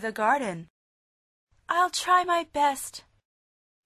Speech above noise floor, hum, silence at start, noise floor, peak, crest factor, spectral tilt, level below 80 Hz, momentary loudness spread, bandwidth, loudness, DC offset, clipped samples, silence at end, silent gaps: over 64 dB; none; 0 s; under -90 dBFS; -10 dBFS; 18 dB; -2.5 dB/octave; -66 dBFS; 16 LU; 13.5 kHz; -25 LUFS; under 0.1%; under 0.1%; 0.85 s; 0.70-1.47 s